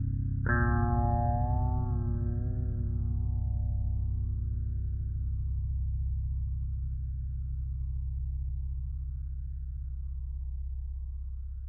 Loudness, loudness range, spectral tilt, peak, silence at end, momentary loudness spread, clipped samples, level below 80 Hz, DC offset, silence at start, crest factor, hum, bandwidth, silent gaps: -34 LUFS; 8 LU; -12 dB/octave; -16 dBFS; 0 s; 11 LU; under 0.1%; -34 dBFS; under 0.1%; 0 s; 16 dB; none; 2 kHz; none